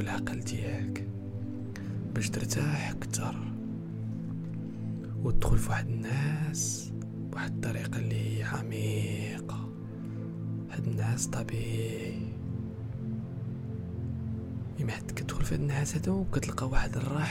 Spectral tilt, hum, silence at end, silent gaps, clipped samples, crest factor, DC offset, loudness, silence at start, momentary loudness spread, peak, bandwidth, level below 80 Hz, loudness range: -5.5 dB/octave; none; 0 s; none; under 0.1%; 20 dB; under 0.1%; -34 LUFS; 0 s; 8 LU; -12 dBFS; 16 kHz; -42 dBFS; 3 LU